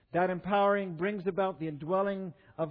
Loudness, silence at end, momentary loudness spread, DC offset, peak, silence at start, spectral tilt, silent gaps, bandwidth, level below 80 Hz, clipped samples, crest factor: -31 LUFS; 0 s; 11 LU; under 0.1%; -16 dBFS; 0.15 s; -10 dB/octave; none; 5 kHz; -68 dBFS; under 0.1%; 14 dB